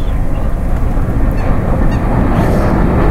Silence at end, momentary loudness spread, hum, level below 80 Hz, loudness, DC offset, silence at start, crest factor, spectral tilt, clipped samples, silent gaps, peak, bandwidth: 0 s; 6 LU; none; -14 dBFS; -15 LUFS; under 0.1%; 0 s; 10 dB; -8.5 dB/octave; under 0.1%; none; 0 dBFS; 13 kHz